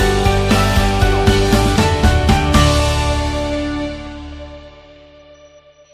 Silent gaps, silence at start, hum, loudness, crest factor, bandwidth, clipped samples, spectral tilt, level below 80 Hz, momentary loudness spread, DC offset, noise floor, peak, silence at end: none; 0 s; none; -15 LUFS; 16 dB; 15.5 kHz; under 0.1%; -5 dB/octave; -20 dBFS; 17 LU; under 0.1%; -45 dBFS; 0 dBFS; 1.25 s